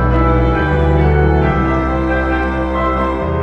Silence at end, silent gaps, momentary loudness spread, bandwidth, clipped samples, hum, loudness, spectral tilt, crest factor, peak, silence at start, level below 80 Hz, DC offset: 0 s; none; 4 LU; 6 kHz; under 0.1%; none; -15 LUFS; -9 dB/octave; 12 dB; 0 dBFS; 0 s; -18 dBFS; 1%